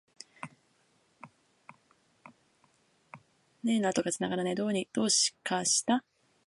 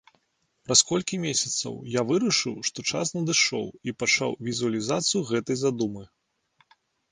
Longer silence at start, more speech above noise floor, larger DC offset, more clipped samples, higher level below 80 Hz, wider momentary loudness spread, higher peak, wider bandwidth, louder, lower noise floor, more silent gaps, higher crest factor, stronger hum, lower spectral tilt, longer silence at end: second, 0.45 s vs 0.7 s; second, 40 dB vs 46 dB; neither; neither; second, -76 dBFS vs -64 dBFS; first, 20 LU vs 9 LU; second, -14 dBFS vs -4 dBFS; about the same, 11.5 kHz vs 11 kHz; second, -29 LUFS vs -25 LUFS; about the same, -70 dBFS vs -72 dBFS; neither; about the same, 20 dB vs 24 dB; neither; about the same, -2.5 dB/octave vs -2.5 dB/octave; second, 0.5 s vs 1.05 s